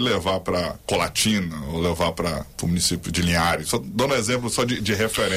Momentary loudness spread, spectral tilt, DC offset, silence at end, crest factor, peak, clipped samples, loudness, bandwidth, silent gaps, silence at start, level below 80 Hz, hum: 6 LU; -4 dB/octave; under 0.1%; 0 s; 14 dB; -10 dBFS; under 0.1%; -23 LUFS; 16 kHz; none; 0 s; -42 dBFS; none